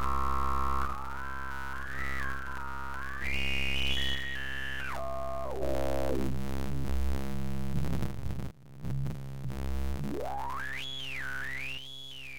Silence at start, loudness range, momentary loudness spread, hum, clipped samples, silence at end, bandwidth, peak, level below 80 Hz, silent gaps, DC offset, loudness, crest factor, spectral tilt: 0 s; 4 LU; 8 LU; none; under 0.1%; 0 s; 17 kHz; -16 dBFS; -40 dBFS; none; 2%; -35 LUFS; 16 dB; -5 dB/octave